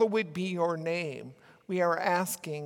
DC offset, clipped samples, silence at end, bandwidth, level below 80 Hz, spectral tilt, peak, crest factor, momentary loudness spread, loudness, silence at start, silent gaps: under 0.1%; under 0.1%; 0 s; 18 kHz; -80 dBFS; -5 dB/octave; -14 dBFS; 16 dB; 10 LU; -30 LUFS; 0 s; none